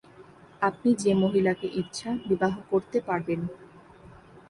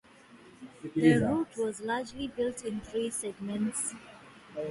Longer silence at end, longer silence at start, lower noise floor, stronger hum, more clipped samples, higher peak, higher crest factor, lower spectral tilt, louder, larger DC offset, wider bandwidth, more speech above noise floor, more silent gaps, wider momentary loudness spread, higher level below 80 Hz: first, 0.4 s vs 0 s; about the same, 0.2 s vs 0.3 s; second, -51 dBFS vs -55 dBFS; neither; neither; about the same, -10 dBFS vs -10 dBFS; second, 16 dB vs 22 dB; about the same, -6 dB/octave vs -5 dB/octave; first, -27 LUFS vs -31 LUFS; neither; about the same, 11.5 kHz vs 11.5 kHz; about the same, 25 dB vs 25 dB; neither; second, 9 LU vs 23 LU; about the same, -60 dBFS vs -60 dBFS